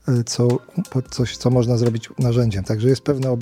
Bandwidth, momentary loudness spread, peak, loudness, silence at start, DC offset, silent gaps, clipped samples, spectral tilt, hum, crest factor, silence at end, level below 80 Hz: 13 kHz; 6 LU; -4 dBFS; -20 LUFS; 0.05 s; under 0.1%; none; under 0.1%; -6.5 dB/octave; none; 16 dB; 0 s; -46 dBFS